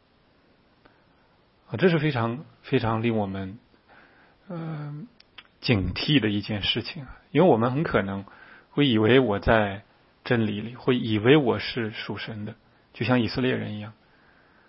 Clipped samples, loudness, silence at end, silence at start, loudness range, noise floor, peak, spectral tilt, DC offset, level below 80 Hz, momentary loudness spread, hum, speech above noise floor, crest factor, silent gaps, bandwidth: under 0.1%; -24 LUFS; 0.8 s; 1.7 s; 6 LU; -62 dBFS; -4 dBFS; -10.5 dB/octave; under 0.1%; -48 dBFS; 18 LU; none; 38 dB; 22 dB; none; 5.8 kHz